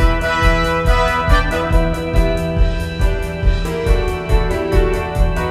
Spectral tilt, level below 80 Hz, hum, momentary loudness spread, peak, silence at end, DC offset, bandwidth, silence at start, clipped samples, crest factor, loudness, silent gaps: -6 dB/octave; -18 dBFS; none; 5 LU; 0 dBFS; 0 s; under 0.1%; 13.5 kHz; 0 s; under 0.1%; 14 dB; -17 LUFS; none